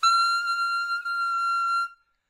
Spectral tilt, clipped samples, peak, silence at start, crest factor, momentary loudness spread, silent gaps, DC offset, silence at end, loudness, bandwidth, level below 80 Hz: 5.5 dB/octave; under 0.1%; -14 dBFS; 0 s; 12 dB; 6 LU; none; under 0.1%; 0.35 s; -24 LUFS; 16 kHz; -82 dBFS